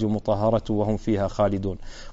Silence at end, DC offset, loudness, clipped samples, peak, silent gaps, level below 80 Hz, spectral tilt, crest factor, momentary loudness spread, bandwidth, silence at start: 0 s; under 0.1%; -24 LUFS; under 0.1%; -10 dBFS; none; -38 dBFS; -7.5 dB/octave; 14 dB; 8 LU; 8 kHz; 0 s